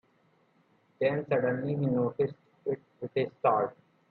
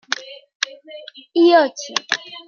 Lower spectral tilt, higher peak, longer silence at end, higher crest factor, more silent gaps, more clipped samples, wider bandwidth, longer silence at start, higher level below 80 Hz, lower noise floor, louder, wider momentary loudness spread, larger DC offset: first, -10.5 dB/octave vs -1 dB/octave; second, -12 dBFS vs 0 dBFS; first, 0.4 s vs 0.05 s; about the same, 18 dB vs 20 dB; second, none vs 0.55-0.60 s; neither; second, 4.5 kHz vs 7.2 kHz; first, 1 s vs 0.15 s; first, -72 dBFS vs -82 dBFS; first, -68 dBFS vs -39 dBFS; second, -31 LUFS vs -18 LUFS; second, 9 LU vs 24 LU; neither